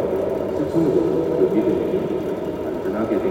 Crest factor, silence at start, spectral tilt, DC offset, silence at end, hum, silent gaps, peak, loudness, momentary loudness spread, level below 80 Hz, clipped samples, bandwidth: 14 dB; 0 s; -8.5 dB/octave; under 0.1%; 0 s; none; none; -6 dBFS; -21 LUFS; 7 LU; -48 dBFS; under 0.1%; 16 kHz